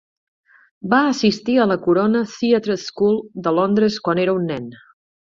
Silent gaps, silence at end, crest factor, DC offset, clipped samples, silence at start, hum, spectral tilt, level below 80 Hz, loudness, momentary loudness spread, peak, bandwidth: none; 0.55 s; 18 dB; under 0.1%; under 0.1%; 0.85 s; none; -6 dB/octave; -58 dBFS; -18 LUFS; 8 LU; -2 dBFS; 7.6 kHz